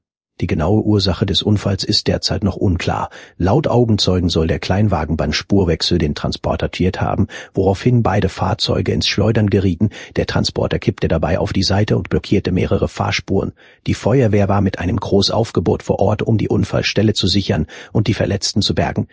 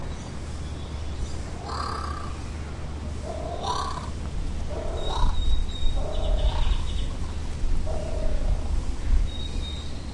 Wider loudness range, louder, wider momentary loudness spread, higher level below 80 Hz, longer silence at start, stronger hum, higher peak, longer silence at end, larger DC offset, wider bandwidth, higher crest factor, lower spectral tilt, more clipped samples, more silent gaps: about the same, 1 LU vs 3 LU; first, -17 LUFS vs -31 LUFS; about the same, 6 LU vs 7 LU; about the same, -30 dBFS vs -28 dBFS; first, 0.4 s vs 0 s; neither; first, 0 dBFS vs -10 dBFS; about the same, 0.1 s vs 0 s; neither; second, 8 kHz vs 11 kHz; about the same, 16 dB vs 16 dB; about the same, -6 dB/octave vs -5.5 dB/octave; neither; neither